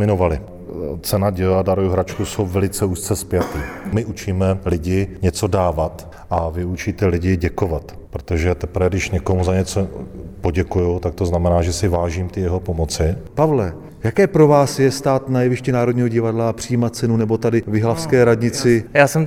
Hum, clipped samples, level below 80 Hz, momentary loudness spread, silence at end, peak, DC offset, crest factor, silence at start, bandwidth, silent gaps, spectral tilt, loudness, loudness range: none; under 0.1%; -36 dBFS; 9 LU; 0 s; 0 dBFS; under 0.1%; 18 dB; 0 s; 18.5 kHz; none; -6.5 dB/octave; -19 LUFS; 4 LU